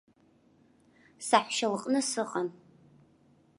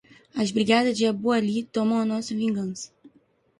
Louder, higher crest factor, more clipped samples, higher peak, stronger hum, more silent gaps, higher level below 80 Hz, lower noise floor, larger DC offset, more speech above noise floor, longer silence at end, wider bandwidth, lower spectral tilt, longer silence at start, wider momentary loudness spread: second, -30 LUFS vs -24 LUFS; first, 26 dB vs 20 dB; neither; about the same, -8 dBFS vs -6 dBFS; neither; neither; second, -80 dBFS vs -66 dBFS; about the same, -65 dBFS vs -63 dBFS; neither; second, 35 dB vs 39 dB; first, 1.05 s vs 0.5 s; about the same, 11.5 kHz vs 11 kHz; second, -2.5 dB/octave vs -5 dB/octave; first, 1.2 s vs 0.35 s; about the same, 11 LU vs 13 LU